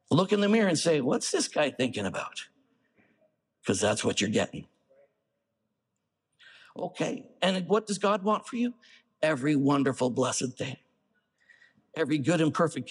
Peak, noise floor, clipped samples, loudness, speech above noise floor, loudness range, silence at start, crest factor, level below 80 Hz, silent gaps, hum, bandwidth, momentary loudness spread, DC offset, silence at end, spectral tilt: -10 dBFS; -82 dBFS; under 0.1%; -28 LUFS; 55 dB; 6 LU; 0.1 s; 18 dB; -72 dBFS; none; none; 12 kHz; 13 LU; under 0.1%; 0 s; -4.5 dB/octave